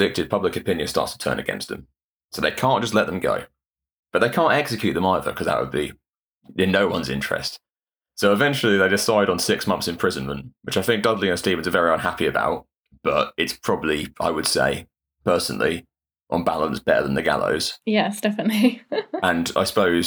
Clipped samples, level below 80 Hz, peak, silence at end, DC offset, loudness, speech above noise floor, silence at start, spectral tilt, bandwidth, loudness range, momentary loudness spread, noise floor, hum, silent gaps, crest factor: under 0.1%; -50 dBFS; -4 dBFS; 0 s; under 0.1%; -22 LUFS; over 68 dB; 0 s; -4.5 dB/octave; over 20 kHz; 3 LU; 9 LU; under -90 dBFS; none; 2.04-2.29 s, 3.67-3.71 s, 3.99-4.03 s, 6.19-6.32 s, 12.77-12.81 s; 18 dB